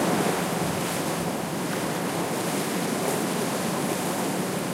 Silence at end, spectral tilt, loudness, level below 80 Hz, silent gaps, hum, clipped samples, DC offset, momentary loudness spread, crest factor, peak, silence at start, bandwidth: 0 s; -4 dB/octave; -27 LUFS; -58 dBFS; none; none; under 0.1%; under 0.1%; 2 LU; 16 dB; -10 dBFS; 0 s; 16 kHz